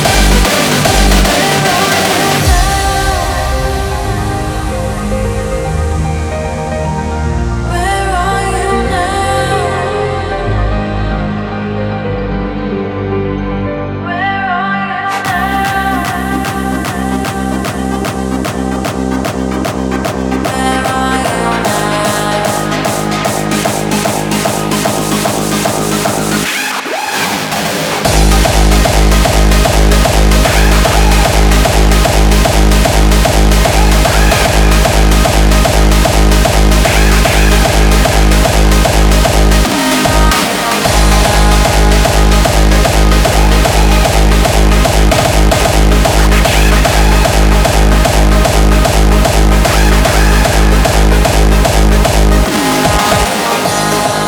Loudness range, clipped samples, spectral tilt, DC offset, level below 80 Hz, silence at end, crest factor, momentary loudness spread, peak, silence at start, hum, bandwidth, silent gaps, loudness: 6 LU; under 0.1%; -4.5 dB/octave; under 0.1%; -12 dBFS; 0 s; 10 dB; 7 LU; 0 dBFS; 0 s; none; 19.5 kHz; none; -11 LUFS